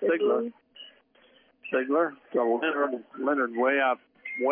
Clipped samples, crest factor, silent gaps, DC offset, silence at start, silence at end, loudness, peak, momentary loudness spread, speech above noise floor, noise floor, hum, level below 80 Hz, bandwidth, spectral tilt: under 0.1%; 14 dB; none; under 0.1%; 0 s; 0 s; -27 LUFS; -14 dBFS; 21 LU; 34 dB; -61 dBFS; none; -84 dBFS; 3.6 kHz; -8 dB/octave